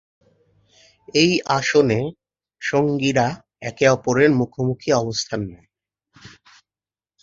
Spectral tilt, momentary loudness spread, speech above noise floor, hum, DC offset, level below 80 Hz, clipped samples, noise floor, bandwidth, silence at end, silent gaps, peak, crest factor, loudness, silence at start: -5 dB/octave; 12 LU; over 71 dB; none; under 0.1%; -54 dBFS; under 0.1%; under -90 dBFS; 7.8 kHz; 1.65 s; none; -2 dBFS; 20 dB; -20 LUFS; 1.15 s